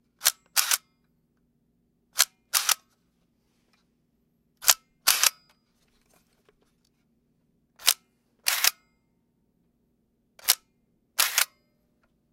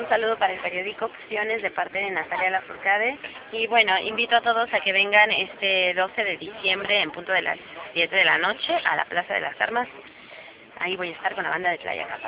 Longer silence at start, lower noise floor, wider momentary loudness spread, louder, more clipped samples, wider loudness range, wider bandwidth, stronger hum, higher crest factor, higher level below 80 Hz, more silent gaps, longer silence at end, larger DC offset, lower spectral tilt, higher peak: first, 0.2 s vs 0 s; first, -71 dBFS vs -45 dBFS; second, 7 LU vs 11 LU; about the same, -24 LUFS vs -23 LUFS; neither; about the same, 3 LU vs 5 LU; first, 17 kHz vs 4 kHz; neither; first, 30 dB vs 22 dB; second, -74 dBFS vs -66 dBFS; neither; first, 0.85 s vs 0 s; neither; second, 4 dB/octave vs -5.5 dB/octave; first, 0 dBFS vs -4 dBFS